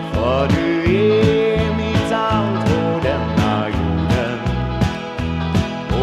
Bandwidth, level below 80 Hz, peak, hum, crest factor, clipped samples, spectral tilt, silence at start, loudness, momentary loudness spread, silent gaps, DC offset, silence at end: 13 kHz; -30 dBFS; -2 dBFS; none; 14 dB; under 0.1%; -7 dB/octave; 0 s; -18 LUFS; 7 LU; none; under 0.1%; 0 s